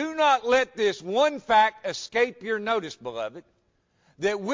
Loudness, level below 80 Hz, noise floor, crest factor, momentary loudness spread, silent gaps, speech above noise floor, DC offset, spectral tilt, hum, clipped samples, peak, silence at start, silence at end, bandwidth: -25 LUFS; -64 dBFS; -69 dBFS; 16 dB; 13 LU; none; 44 dB; under 0.1%; -3.5 dB/octave; none; under 0.1%; -8 dBFS; 0 s; 0 s; 7.6 kHz